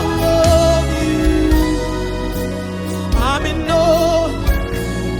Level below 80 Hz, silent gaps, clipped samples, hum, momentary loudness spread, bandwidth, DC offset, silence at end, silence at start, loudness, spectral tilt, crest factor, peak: -22 dBFS; none; under 0.1%; none; 9 LU; 19.5 kHz; under 0.1%; 0 s; 0 s; -16 LUFS; -5.5 dB/octave; 14 dB; -2 dBFS